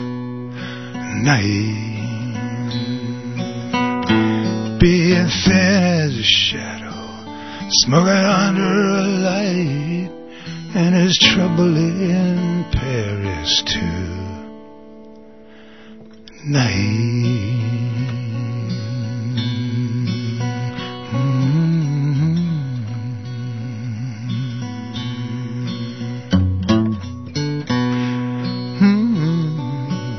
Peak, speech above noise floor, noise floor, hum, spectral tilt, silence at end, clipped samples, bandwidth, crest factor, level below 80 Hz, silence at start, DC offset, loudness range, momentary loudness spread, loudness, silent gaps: 0 dBFS; 26 dB; -42 dBFS; none; -5.5 dB/octave; 0 s; under 0.1%; 6.4 kHz; 18 dB; -40 dBFS; 0 s; 0.5%; 8 LU; 14 LU; -19 LUFS; none